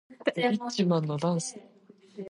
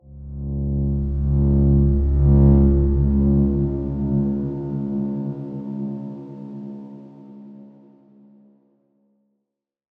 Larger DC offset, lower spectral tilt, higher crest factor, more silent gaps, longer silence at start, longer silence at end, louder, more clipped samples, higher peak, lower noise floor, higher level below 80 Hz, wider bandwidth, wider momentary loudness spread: neither; second, -5.5 dB/octave vs -14 dB/octave; about the same, 18 dB vs 18 dB; neither; about the same, 0.1 s vs 0.1 s; second, 0 s vs 2.3 s; second, -29 LUFS vs -20 LUFS; neither; second, -12 dBFS vs -4 dBFS; second, -49 dBFS vs -80 dBFS; second, -78 dBFS vs -26 dBFS; first, 11.5 kHz vs 1.8 kHz; second, 16 LU vs 20 LU